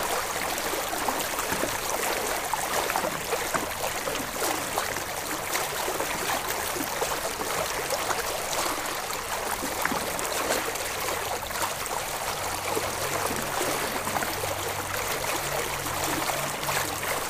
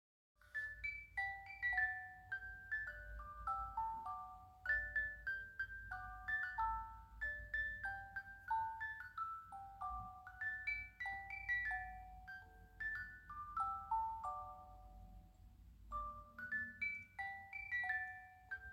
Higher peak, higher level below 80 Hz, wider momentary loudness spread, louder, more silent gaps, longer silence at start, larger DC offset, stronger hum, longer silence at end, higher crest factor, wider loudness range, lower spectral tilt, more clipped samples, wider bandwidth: first, -8 dBFS vs -28 dBFS; first, -50 dBFS vs -62 dBFS; second, 3 LU vs 15 LU; first, -28 LUFS vs -44 LUFS; neither; second, 0 s vs 0.4 s; neither; neither; about the same, 0 s vs 0 s; about the same, 22 dB vs 18 dB; second, 1 LU vs 4 LU; second, -2 dB/octave vs -4.5 dB/octave; neither; about the same, 15.5 kHz vs 16.5 kHz